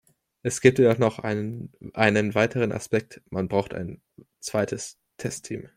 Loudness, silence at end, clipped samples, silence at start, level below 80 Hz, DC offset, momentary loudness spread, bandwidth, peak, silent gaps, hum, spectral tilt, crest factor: -25 LUFS; 0.1 s; under 0.1%; 0.45 s; -58 dBFS; under 0.1%; 15 LU; 15.5 kHz; -2 dBFS; none; none; -5.5 dB/octave; 24 dB